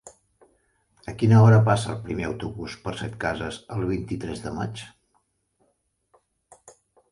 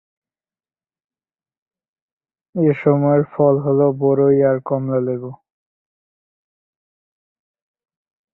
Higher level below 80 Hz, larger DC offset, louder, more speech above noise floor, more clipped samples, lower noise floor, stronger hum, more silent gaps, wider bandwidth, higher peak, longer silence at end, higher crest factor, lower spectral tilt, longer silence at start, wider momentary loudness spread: first, -50 dBFS vs -62 dBFS; neither; second, -24 LUFS vs -17 LUFS; second, 49 dB vs over 74 dB; neither; second, -71 dBFS vs under -90 dBFS; neither; neither; first, 11 kHz vs 3.1 kHz; second, -6 dBFS vs -2 dBFS; second, 0.4 s vs 3 s; about the same, 20 dB vs 18 dB; second, -7 dB/octave vs -13 dB/octave; second, 0.05 s vs 2.55 s; first, 17 LU vs 10 LU